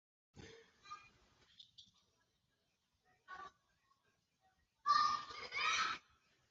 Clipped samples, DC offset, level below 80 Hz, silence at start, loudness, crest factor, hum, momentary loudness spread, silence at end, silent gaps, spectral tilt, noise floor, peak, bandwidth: under 0.1%; under 0.1%; -78 dBFS; 0.35 s; -38 LUFS; 22 dB; none; 26 LU; 0.5 s; none; 2 dB/octave; -84 dBFS; -22 dBFS; 7.6 kHz